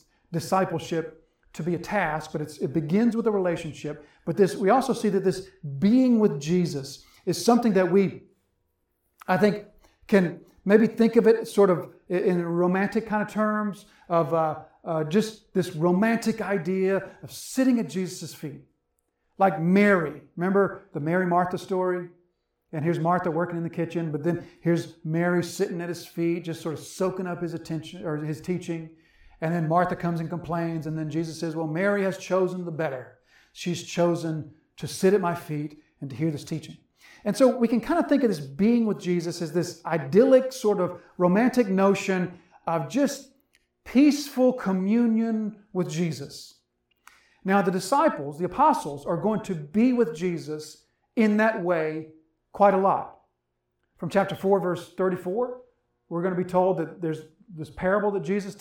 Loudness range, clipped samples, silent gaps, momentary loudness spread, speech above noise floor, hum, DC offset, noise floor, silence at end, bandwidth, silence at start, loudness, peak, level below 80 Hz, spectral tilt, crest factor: 5 LU; under 0.1%; none; 14 LU; 53 dB; none; under 0.1%; -78 dBFS; 0.05 s; 17 kHz; 0.3 s; -25 LUFS; -4 dBFS; -62 dBFS; -6.5 dB/octave; 20 dB